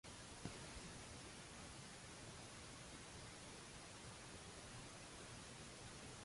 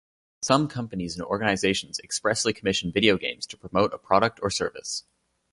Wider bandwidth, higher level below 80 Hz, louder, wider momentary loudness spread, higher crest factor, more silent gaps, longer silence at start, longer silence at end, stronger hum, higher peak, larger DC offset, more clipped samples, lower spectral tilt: about the same, 11.5 kHz vs 11.5 kHz; second, -68 dBFS vs -54 dBFS; second, -55 LUFS vs -25 LUFS; second, 2 LU vs 10 LU; about the same, 20 dB vs 22 dB; neither; second, 0.05 s vs 0.4 s; second, 0 s vs 0.55 s; neither; second, -36 dBFS vs -4 dBFS; neither; neither; about the same, -3 dB/octave vs -3.5 dB/octave